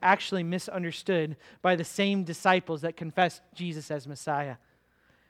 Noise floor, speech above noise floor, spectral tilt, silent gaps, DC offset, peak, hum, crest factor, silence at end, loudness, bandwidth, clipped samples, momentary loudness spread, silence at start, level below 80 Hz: -66 dBFS; 37 dB; -5 dB/octave; none; under 0.1%; -8 dBFS; none; 22 dB; 0.75 s; -29 LUFS; 15 kHz; under 0.1%; 12 LU; 0 s; -72 dBFS